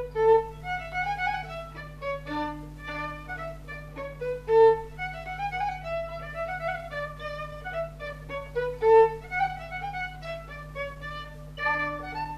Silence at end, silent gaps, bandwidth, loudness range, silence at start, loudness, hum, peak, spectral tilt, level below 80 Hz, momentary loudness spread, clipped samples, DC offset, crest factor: 0 s; none; 13 kHz; 6 LU; 0 s; -29 LUFS; none; -10 dBFS; -6 dB/octave; -46 dBFS; 17 LU; under 0.1%; under 0.1%; 18 dB